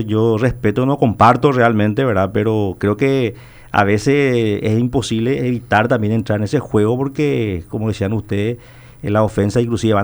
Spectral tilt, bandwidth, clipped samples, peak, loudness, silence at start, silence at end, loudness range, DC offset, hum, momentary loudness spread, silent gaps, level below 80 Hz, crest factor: -7 dB/octave; over 20 kHz; under 0.1%; 0 dBFS; -16 LUFS; 0 s; 0 s; 4 LU; under 0.1%; none; 7 LU; none; -42 dBFS; 16 dB